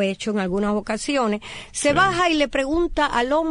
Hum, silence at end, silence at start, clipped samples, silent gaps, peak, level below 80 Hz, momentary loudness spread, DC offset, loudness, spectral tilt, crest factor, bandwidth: none; 0 s; 0 s; under 0.1%; none; -6 dBFS; -40 dBFS; 7 LU; under 0.1%; -21 LUFS; -4 dB/octave; 14 dB; 11 kHz